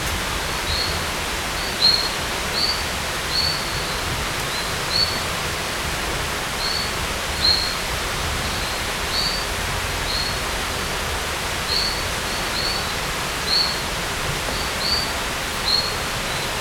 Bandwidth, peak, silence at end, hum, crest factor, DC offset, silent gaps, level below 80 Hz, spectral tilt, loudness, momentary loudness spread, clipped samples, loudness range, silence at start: over 20 kHz; -4 dBFS; 0 s; none; 18 dB; under 0.1%; none; -34 dBFS; -2 dB/octave; -21 LUFS; 5 LU; under 0.1%; 2 LU; 0 s